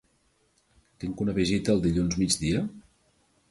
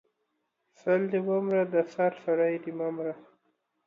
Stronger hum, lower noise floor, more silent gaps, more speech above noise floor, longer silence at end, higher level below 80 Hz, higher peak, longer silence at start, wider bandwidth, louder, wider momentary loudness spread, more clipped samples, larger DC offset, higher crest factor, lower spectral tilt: neither; second, -68 dBFS vs -79 dBFS; neither; second, 42 dB vs 51 dB; about the same, 0.7 s vs 0.65 s; first, -46 dBFS vs -82 dBFS; first, -10 dBFS vs -14 dBFS; first, 1 s vs 0.85 s; first, 11.5 kHz vs 7.2 kHz; about the same, -27 LUFS vs -29 LUFS; about the same, 12 LU vs 10 LU; neither; neither; about the same, 18 dB vs 16 dB; second, -5 dB/octave vs -8.5 dB/octave